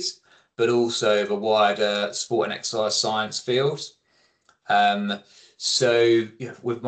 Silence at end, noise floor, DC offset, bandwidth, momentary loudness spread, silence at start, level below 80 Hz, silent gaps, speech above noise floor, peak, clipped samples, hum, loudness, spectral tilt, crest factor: 0 s; -65 dBFS; under 0.1%; 9.2 kHz; 12 LU; 0 s; -72 dBFS; none; 42 dB; -8 dBFS; under 0.1%; none; -22 LUFS; -3.5 dB/octave; 16 dB